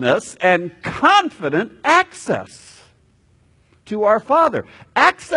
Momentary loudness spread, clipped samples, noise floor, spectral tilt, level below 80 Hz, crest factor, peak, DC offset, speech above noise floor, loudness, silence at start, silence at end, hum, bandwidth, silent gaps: 12 LU; under 0.1%; -56 dBFS; -4 dB/octave; -56 dBFS; 18 dB; 0 dBFS; under 0.1%; 39 dB; -17 LUFS; 0 s; 0 s; none; 11 kHz; none